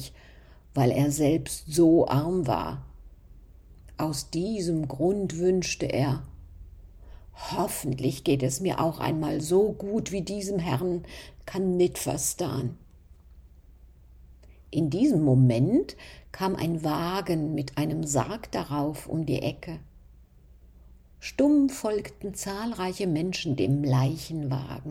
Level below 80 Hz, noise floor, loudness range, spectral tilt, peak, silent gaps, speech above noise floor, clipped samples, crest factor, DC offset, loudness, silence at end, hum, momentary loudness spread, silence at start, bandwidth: -50 dBFS; -53 dBFS; 5 LU; -6 dB/octave; -10 dBFS; none; 27 dB; under 0.1%; 16 dB; under 0.1%; -27 LUFS; 0 s; none; 12 LU; 0 s; 17 kHz